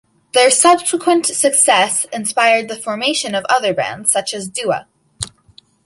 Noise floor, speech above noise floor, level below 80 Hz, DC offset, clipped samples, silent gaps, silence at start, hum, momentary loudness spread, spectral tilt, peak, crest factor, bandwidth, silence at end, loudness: -49 dBFS; 34 dB; -56 dBFS; under 0.1%; under 0.1%; none; 0.35 s; none; 13 LU; -1.5 dB/octave; 0 dBFS; 16 dB; 12 kHz; 0.6 s; -14 LUFS